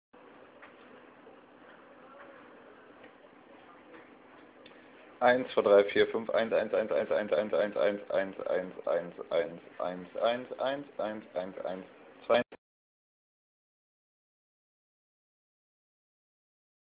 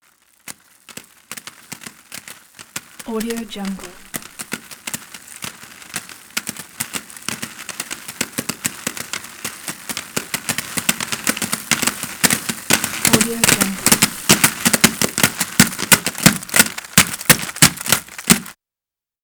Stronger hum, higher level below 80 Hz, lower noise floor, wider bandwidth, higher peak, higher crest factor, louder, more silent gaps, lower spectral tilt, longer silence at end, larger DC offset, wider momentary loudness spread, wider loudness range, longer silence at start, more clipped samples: neither; second, -74 dBFS vs -50 dBFS; second, -56 dBFS vs -89 dBFS; second, 4 kHz vs over 20 kHz; second, -12 dBFS vs 0 dBFS; about the same, 22 dB vs 20 dB; second, -31 LUFS vs -17 LUFS; neither; about the same, -2.5 dB/octave vs -2 dB/octave; first, 4.35 s vs 0.7 s; neither; second, 17 LU vs 21 LU; second, 9 LU vs 15 LU; first, 0.6 s vs 0.45 s; neither